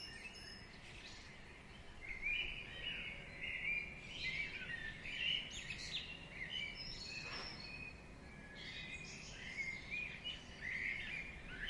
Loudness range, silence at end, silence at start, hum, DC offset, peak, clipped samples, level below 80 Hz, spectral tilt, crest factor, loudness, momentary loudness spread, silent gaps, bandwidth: 5 LU; 0 s; 0 s; none; under 0.1%; -28 dBFS; under 0.1%; -60 dBFS; -2.5 dB/octave; 18 dB; -44 LUFS; 14 LU; none; 11.5 kHz